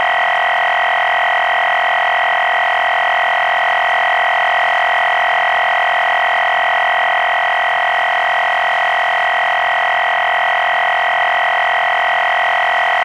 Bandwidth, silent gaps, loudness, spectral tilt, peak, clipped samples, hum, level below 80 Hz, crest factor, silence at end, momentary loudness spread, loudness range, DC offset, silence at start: 15 kHz; none; -13 LUFS; -0.5 dB/octave; -4 dBFS; under 0.1%; none; -60 dBFS; 10 dB; 0 s; 1 LU; 1 LU; under 0.1%; 0 s